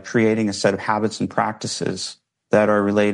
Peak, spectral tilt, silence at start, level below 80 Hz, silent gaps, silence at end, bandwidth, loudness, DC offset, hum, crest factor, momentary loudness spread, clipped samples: -4 dBFS; -5 dB/octave; 0.05 s; -62 dBFS; none; 0 s; 11.5 kHz; -20 LUFS; under 0.1%; none; 16 dB; 8 LU; under 0.1%